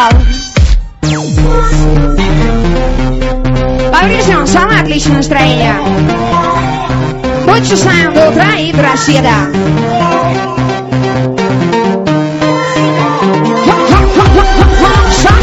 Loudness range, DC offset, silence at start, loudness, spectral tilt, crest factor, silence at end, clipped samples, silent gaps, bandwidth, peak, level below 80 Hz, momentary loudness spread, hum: 3 LU; under 0.1%; 0 s; -9 LUFS; -5.5 dB/octave; 8 dB; 0 s; 1%; none; 8.2 kHz; 0 dBFS; -14 dBFS; 6 LU; none